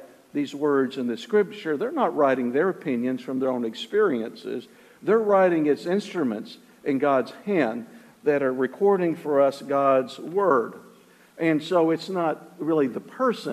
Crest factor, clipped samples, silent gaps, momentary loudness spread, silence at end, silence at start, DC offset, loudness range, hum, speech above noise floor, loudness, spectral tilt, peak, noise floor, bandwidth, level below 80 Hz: 16 dB; under 0.1%; none; 9 LU; 0 s; 0 s; under 0.1%; 2 LU; none; 30 dB; -24 LUFS; -6.5 dB/octave; -8 dBFS; -53 dBFS; 14 kHz; -76 dBFS